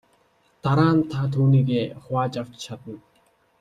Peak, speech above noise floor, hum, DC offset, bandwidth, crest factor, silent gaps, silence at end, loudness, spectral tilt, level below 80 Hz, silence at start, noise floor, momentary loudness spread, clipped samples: -4 dBFS; 41 dB; none; under 0.1%; 9 kHz; 18 dB; none; 0.6 s; -22 LUFS; -8 dB/octave; -58 dBFS; 0.65 s; -63 dBFS; 18 LU; under 0.1%